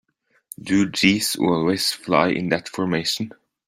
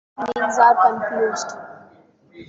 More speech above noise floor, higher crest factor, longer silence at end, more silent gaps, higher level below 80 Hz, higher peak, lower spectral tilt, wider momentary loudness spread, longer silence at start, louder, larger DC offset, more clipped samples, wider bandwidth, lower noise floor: second, 25 dB vs 34 dB; about the same, 20 dB vs 18 dB; first, 0.4 s vs 0.05 s; neither; first, -58 dBFS vs -66 dBFS; about the same, -2 dBFS vs -2 dBFS; about the same, -4 dB/octave vs -3 dB/octave; second, 10 LU vs 16 LU; first, 0.6 s vs 0.2 s; second, -21 LUFS vs -18 LUFS; neither; neither; first, 16 kHz vs 8 kHz; second, -45 dBFS vs -52 dBFS